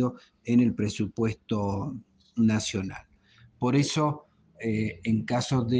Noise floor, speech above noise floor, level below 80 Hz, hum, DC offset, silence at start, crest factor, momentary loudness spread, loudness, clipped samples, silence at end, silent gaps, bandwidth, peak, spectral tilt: -58 dBFS; 32 dB; -58 dBFS; none; under 0.1%; 0 s; 16 dB; 14 LU; -28 LUFS; under 0.1%; 0 s; none; 9.6 kHz; -12 dBFS; -6 dB/octave